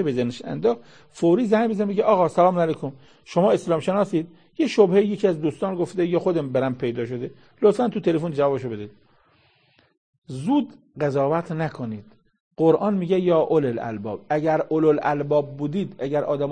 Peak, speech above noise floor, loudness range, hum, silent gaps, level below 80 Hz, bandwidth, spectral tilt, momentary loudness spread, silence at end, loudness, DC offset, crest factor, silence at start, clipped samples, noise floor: -4 dBFS; 39 dB; 6 LU; none; 9.97-10.22 s, 12.40-12.51 s; -62 dBFS; 9.8 kHz; -7.5 dB/octave; 12 LU; 0 s; -22 LUFS; 0.1%; 18 dB; 0 s; under 0.1%; -61 dBFS